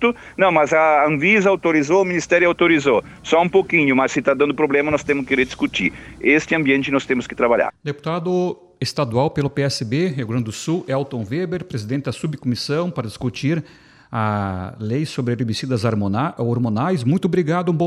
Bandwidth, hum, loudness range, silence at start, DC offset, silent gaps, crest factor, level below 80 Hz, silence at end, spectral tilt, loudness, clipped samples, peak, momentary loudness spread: 12.5 kHz; none; 8 LU; 0 s; under 0.1%; none; 18 dB; -52 dBFS; 0 s; -6 dB/octave; -19 LUFS; under 0.1%; -2 dBFS; 10 LU